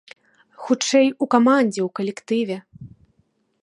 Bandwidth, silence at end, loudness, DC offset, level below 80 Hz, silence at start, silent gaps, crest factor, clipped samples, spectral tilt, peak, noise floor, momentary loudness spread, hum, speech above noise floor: 11 kHz; 0.75 s; -20 LUFS; under 0.1%; -66 dBFS; 0.6 s; none; 20 dB; under 0.1%; -4.5 dB/octave; -2 dBFS; -66 dBFS; 12 LU; none; 47 dB